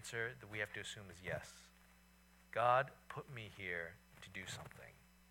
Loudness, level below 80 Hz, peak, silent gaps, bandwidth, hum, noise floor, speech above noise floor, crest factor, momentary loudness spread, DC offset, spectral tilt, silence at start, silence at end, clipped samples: -43 LUFS; -72 dBFS; -20 dBFS; none; 18 kHz; none; -68 dBFS; 24 dB; 24 dB; 22 LU; under 0.1%; -4 dB/octave; 0 s; 0.35 s; under 0.1%